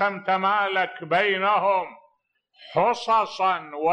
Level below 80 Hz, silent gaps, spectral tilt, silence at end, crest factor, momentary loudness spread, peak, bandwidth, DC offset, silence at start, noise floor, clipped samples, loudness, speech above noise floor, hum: -74 dBFS; none; -4.5 dB/octave; 0 s; 14 dB; 5 LU; -10 dBFS; 9.4 kHz; under 0.1%; 0 s; -68 dBFS; under 0.1%; -23 LUFS; 46 dB; none